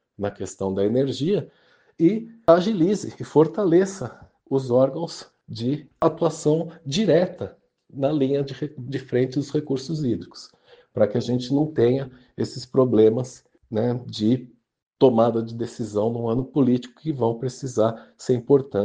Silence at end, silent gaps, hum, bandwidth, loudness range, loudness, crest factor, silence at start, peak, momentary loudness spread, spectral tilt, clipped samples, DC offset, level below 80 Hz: 0 s; 14.83-14.91 s; none; 9.6 kHz; 4 LU; -23 LUFS; 22 dB; 0.2 s; 0 dBFS; 13 LU; -7 dB/octave; under 0.1%; under 0.1%; -60 dBFS